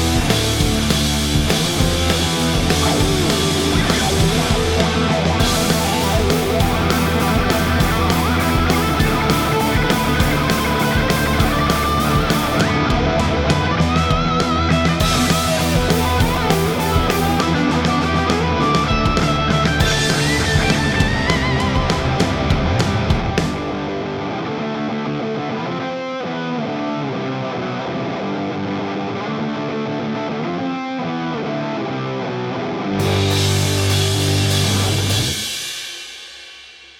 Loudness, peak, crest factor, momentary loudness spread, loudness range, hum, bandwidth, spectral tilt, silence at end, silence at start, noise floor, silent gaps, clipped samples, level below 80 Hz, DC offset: -18 LUFS; 0 dBFS; 18 dB; 7 LU; 7 LU; none; 19 kHz; -4.5 dB/octave; 0.15 s; 0 s; -40 dBFS; none; under 0.1%; -28 dBFS; under 0.1%